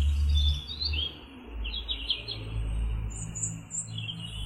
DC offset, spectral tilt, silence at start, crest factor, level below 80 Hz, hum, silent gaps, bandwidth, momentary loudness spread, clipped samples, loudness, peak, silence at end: under 0.1%; -3 dB/octave; 0 s; 16 dB; -32 dBFS; none; none; 10.5 kHz; 9 LU; under 0.1%; -32 LUFS; -16 dBFS; 0 s